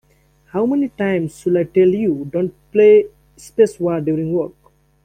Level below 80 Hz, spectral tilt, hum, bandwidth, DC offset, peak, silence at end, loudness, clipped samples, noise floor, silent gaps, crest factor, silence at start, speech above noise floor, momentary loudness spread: -54 dBFS; -8 dB/octave; none; 10 kHz; under 0.1%; -2 dBFS; 0.55 s; -17 LUFS; under 0.1%; -55 dBFS; none; 16 dB; 0.55 s; 39 dB; 11 LU